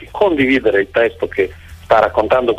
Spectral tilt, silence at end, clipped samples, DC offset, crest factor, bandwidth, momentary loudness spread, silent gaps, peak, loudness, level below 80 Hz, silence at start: -6.5 dB/octave; 0 s; under 0.1%; under 0.1%; 12 dB; 13.5 kHz; 6 LU; none; -2 dBFS; -15 LUFS; -40 dBFS; 0 s